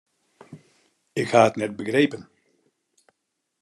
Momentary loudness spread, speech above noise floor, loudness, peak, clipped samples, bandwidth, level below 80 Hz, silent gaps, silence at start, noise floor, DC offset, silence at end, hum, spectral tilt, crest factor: 13 LU; 57 dB; -22 LUFS; -2 dBFS; under 0.1%; 12 kHz; -72 dBFS; none; 0.5 s; -79 dBFS; under 0.1%; 1.4 s; none; -5.5 dB/octave; 24 dB